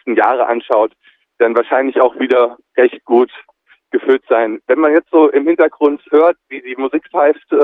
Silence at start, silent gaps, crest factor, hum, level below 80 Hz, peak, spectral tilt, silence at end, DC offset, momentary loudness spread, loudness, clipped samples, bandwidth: 0.05 s; none; 14 dB; none; -68 dBFS; 0 dBFS; -6.5 dB/octave; 0 s; under 0.1%; 8 LU; -14 LUFS; under 0.1%; 4 kHz